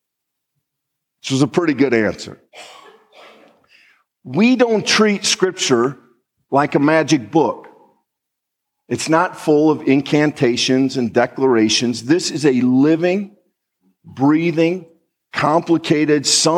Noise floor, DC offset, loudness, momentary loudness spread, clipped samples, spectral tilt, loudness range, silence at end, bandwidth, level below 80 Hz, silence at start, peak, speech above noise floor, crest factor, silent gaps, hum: -79 dBFS; under 0.1%; -16 LUFS; 9 LU; under 0.1%; -4.5 dB/octave; 6 LU; 0 s; 13 kHz; -64 dBFS; 1.25 s; -2 dBFS; 63 dB; 16 dB; none; none